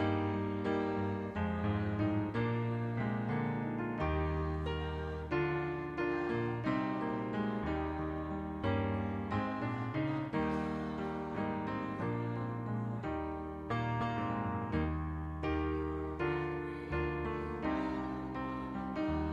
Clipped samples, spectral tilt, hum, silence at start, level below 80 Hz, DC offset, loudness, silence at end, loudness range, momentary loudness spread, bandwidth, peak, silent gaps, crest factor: under 0.1%; -8.5 dB/octave; none; 0 s; -48 dBFS; under 0.1%; -37 LUFS; 0 s; 2 LU; 4 LU; 8.2 kHz; -20 dBFS; none; 16 dB